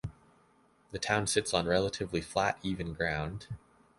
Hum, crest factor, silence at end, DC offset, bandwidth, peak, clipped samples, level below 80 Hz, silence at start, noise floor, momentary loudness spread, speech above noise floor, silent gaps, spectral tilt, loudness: none; 22 dB; 0.4 s; under 0.1%; 11.5 kHz; -12 dBFS; under 0.1%; -52 dBFS; 0.05 s; -66 dBFS; 16 LU; 34 dB; none; -4 dB/octave; -32 LUFS